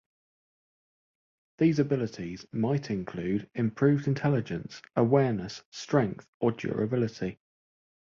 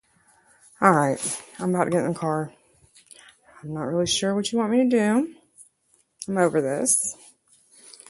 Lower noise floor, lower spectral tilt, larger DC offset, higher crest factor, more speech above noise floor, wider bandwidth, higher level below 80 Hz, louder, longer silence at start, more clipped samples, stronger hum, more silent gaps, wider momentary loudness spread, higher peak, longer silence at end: first, under -90 dBFS vs -66 dBFS; first, -7.5 dB/octave vs -4 dB/octave; neither; second, 18 dB vs 24 dB; first, over 62 dB vs 43 dB; second, 7.4 kHz vs 12 kHz; about the same, -62 dBFS vs -64 dBFS; second, -29 LUFS vs -23 LUFS; first, 1.6 s vs 0.8 s; neither; neither; first, 5.65-5.72 s, 6.28-6.40 s vs none; about the same, 12 LU vs 13 LU; second, -10 dBFS vs 0 dBFS; about the same, 0.85 s vs 0.95 s